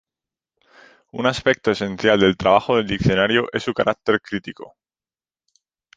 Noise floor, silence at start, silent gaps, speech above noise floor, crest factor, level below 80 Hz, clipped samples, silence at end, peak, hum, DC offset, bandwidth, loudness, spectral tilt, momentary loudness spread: under -90 dBFS; 1.15 s; none; over 71 dB; 20 dB; -46 dBFS; under 0.1%; 1.3 s; -2 dBFS; none; under 0.1%; 9.2 kHz; -19 LUFS; -5.5 dB/octave; 13 LU